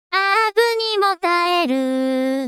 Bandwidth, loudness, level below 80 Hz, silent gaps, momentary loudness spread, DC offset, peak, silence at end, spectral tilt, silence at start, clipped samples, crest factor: 16 kHz; -18 LUFS; -74 dBFS; none; 4 LU; under 0.1%; -2 dBFS; 0 s; -2 dB/octave; 0.1 s; under 0.1%; 16 dB